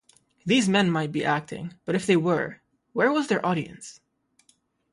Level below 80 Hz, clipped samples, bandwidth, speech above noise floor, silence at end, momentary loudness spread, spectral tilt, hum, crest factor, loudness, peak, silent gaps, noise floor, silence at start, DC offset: -66 dBFS; under 0.1%; 11.5 kHz; 42 dB; 1 s; 16 LU; -5 dB/octave; none; 18 dB; -24 LUFS; -8 dBFS; none; -66 dBFS; 0.45 s; under 0.1%